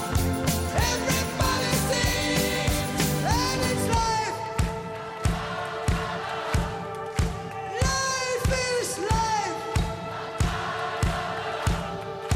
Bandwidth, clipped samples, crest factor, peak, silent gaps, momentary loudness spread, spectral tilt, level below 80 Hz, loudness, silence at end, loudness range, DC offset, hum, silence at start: 17 kHz; under 0.1%; 16 dB; -10 dBFS; none; 7 LU; -4 dB/octave; -34 dBFS; -26 LUFS; 0 s; 4 LU; under 0.1%; none; 0 s